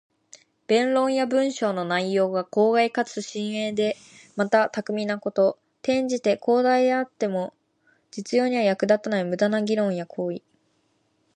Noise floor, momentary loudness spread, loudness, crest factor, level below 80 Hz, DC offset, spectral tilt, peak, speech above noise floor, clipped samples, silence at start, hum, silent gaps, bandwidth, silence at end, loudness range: -68 dBFS; 10 LU; -24 LUFS; 18 dB; -74 dBFS; under 0.1%; -5 dB/octave; -6 dBFS; 45 dB; under 0.1%; 0.7 s; none; none; 10.5 kHz; 0.95 s; 2 LU